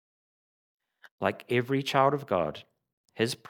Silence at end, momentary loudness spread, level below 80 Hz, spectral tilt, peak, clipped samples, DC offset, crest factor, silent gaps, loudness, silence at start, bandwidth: 0.15 s; 8 LU; -68 dBFS; -5.5 dB/octave; -8 dBFS; under 0.1%; under 0.1%; 22 dB; 2.93-3.04 s; -28 LUFS; 1.2 s; 18.5 kHz